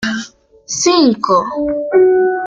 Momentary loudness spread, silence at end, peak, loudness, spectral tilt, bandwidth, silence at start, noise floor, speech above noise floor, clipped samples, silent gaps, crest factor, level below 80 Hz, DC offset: 12 LU; 0 s; -2 dBFS; -13 LUFS; -3 dB/octave; 7.6 kHz; 0 s; -35 dBFS; 23 dB; under 0.1%; none; 12 dB; -50 dBFS; under 0.1%